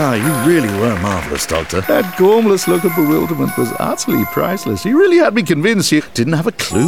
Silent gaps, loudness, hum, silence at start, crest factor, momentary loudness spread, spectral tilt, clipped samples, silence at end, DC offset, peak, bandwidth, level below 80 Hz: none; -14 LUFS; none; 0 s; 12 dB; 7 LU; -5 dB/octave; under 0.1%; 0 s; 1%; -2 dBFS; 17.5 kHz; -40 dBFS